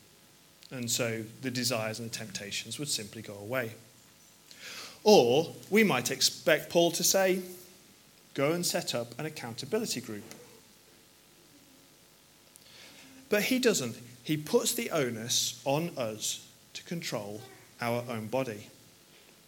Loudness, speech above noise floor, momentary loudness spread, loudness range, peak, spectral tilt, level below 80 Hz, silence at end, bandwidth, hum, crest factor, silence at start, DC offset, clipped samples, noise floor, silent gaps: -30 LUFS; 29 dB; 19 LU; 11 LU; -8 dBFS; -3 dB/octave; -76 dBFS; 0.75 s; 17.5 kHz; none; 24 dB; 0.7 s; under 0.1%; under 0.1%; -60 dBFS; none